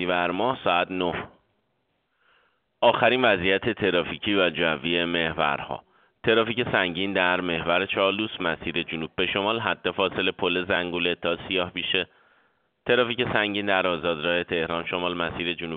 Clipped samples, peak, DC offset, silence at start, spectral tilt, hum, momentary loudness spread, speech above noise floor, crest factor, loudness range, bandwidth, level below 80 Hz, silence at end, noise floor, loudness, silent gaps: under 0.1%; -4 dBFS; under 0.1%; 0 s; -2 dB/octave; none; 6 LU; 48 dB; 20 dB; 2 LU; 4.7 kHz; -56 dBFS; 0 s; -73 dBFS; -24 LUFS; none